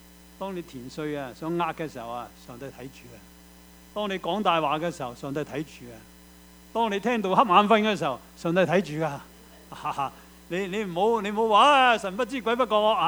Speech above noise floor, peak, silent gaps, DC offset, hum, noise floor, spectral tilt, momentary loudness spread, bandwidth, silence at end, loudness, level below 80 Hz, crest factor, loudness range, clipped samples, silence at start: 25 dB; -4 dBFS; none; under 0.1%; none; -51 dBFS; -5 dB/octave; 21 LU; over 20 kHz; 0 s; -25 LUFS; -58 dBFS; 22 dB; 10 LU; under 0.1%; 0.4 s